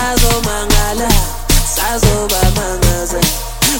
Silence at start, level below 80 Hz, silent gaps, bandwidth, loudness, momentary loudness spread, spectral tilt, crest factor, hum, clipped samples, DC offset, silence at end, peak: 0 s; -16 dBFS; none; 17.5 kHz; -14 LUFS; 2 LU; -3.5 dB/octave; 12 dB; none; under 0.1%; under 0.1%; 0 s; 0 dBFS